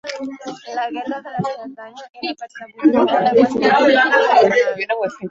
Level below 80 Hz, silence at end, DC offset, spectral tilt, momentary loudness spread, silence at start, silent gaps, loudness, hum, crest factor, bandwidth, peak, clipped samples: -60 dBFS; 0 s; under 0.1%; -5 dB/octave; 19 LU; 0.05 s; none; -16 LUFS; none; 16 dB; 7.8 kHz; -2 dBFS; under 0.1%